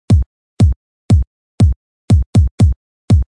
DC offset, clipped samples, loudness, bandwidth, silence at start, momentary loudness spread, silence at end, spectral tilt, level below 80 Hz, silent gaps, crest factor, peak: under 0.1%; under 0.1%; -15 LUFS; 11 kHz; 0.1 s; 15 LU; 0.05 s; -8.5 dB/octave; -20 dBFS; 0.26-0.57 s, 0.76-1.09 s, 1.27-1.58 s, 1.76-2.08 s, 2.26-2.33 s, 2.51-2.58 s, 2.76-3.08 s; 12 dB; -2 dBFS